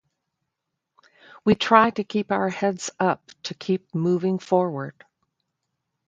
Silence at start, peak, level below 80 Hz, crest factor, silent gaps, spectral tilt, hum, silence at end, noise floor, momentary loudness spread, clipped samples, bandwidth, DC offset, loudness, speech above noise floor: 1.45 s; 0 dBFS; -64 dBFS; 24 dB; none; -5.5 dB/octave; none; 1.15 s; -82 dBFS; 14 LU; under 0.1%; 9.2 kHz; under 0.1%; -23 LUFS; 59 dB